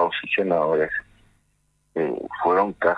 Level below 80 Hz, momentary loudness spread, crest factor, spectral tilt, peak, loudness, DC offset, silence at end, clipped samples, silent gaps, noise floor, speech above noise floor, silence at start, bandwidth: -58 dBFS; 7 LU; 16 dB; -7 dB/octave; -6 dBFS; -23 LUFS; under 0.1%; 0 s; under 0.1%; none; -67 dBFS; 45 dB; 0 s; 9.6 kHz